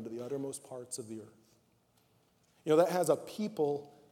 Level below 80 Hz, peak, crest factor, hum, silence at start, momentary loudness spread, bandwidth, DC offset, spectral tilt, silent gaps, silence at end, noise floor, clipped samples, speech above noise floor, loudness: -84 dBFS; -14 dBFS; 22 dB; none; 0 s; 16 LU; 17.5 kHz; under 0.1%; -5 dB/octave; none; 0.2 s; -71 dBFS; under 0.1%; 38 dB; -34 LUFS